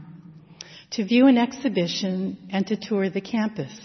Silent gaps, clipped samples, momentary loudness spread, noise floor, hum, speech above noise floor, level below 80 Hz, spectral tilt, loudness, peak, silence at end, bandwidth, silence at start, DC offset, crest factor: none; under 0.1%; 15 LU; -46 dBFS; none; 23 dB; -68 dBFS; -5.5 dB/octave; -23 LUFS; -6 dBFS; 0 s; 6.4 kHz; 0 s; under 0.1%; 18 dB